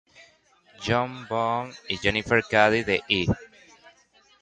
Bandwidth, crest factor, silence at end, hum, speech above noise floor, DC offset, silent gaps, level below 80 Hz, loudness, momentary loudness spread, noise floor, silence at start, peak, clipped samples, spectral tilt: 9.4 kHz; 22 dB; 0.95 s; none; 36 dB; under 0.1%; none; -48 dBFS; -24 LUFS; 11 LU; -60 dBFS; 0.8 s; -4 dBFS; under 0.1%; -5 dB/octave